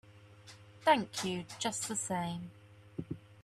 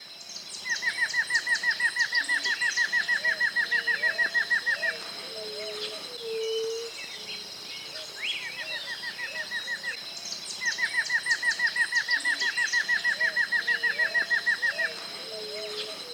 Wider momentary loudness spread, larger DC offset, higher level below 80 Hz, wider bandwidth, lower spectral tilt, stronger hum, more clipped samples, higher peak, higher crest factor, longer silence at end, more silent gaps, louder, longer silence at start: first, 23 LU vs 12 LU; neither; first, -70 dBFS vs -78 dBFS; second, 14 kHz vs 19 kHz; first, -3.5 dB/octave vs 0.5 dB/octave; neither; neither; about the same, -14 dBFS vs -14 dBFS; first, 22 dB vs 16 dB; about the same, 0 s vs 0 s; neither; second, -35 LUFS vs -27 LUFS; about the same, 0.05 s vs 0 s